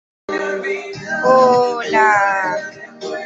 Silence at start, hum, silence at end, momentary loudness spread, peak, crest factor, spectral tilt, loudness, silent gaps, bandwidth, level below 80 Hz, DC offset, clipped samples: 0.3 s; none; 0 s; 14 LU; -2 dBFS; 16 dB; -4 dB/octave; -16 LUFS; none; 8 kHz; -60 dBFS; under 0.1%; under 0.1%